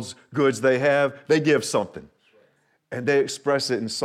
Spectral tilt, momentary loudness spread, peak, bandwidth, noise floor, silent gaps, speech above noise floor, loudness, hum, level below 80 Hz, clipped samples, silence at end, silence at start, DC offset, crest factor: -4.5 dB/octave; 11 LU; -8 dBFS; 14 kHz; -64 dBFS; none; 41 dB; -22 LUFS; none; -70 dBFS; under 0.1%; 0 s; 0 s; under 0.1%; 16 dB